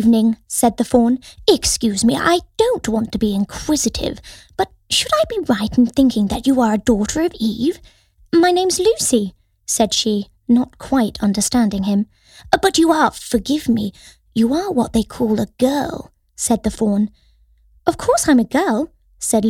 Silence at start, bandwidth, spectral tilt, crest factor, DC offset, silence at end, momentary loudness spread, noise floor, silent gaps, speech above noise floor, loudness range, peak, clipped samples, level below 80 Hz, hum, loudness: 0 s; 16 kHz; -4 dB/octave; 16 dB; under 0.1%; 0 s; 9 LU; -53 dBFS; none; 37 dB; 3 LU; 0 dBFS; under 0.1%; -40 dBFS; none; -17 LUFS